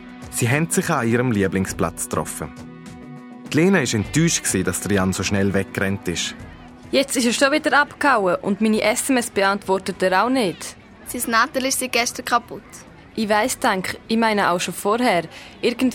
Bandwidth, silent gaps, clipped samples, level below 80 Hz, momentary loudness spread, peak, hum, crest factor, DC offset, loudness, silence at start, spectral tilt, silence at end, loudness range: 17.5 kHz; none; under 0.1%; -48 dBFS; 16 LU; -4 dBFS; none; 18 dB; under 0.1%; -20 LUFS; 0 s; -4 dB/octave; 0 s; 3 LU